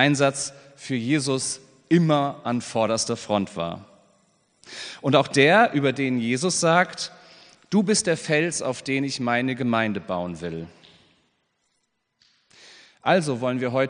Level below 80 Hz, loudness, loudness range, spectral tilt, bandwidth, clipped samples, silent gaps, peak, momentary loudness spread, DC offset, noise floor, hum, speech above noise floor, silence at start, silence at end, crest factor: -68 dBFS; -23 LUFS; 8 LU; -4.5 dB/octave; 10 kHz; under 0.1%; none; -2 dBFS; 14 LU; under 0.1%; -74 dBFS; none; 51 dB; 0 s; 0 s; 22 dB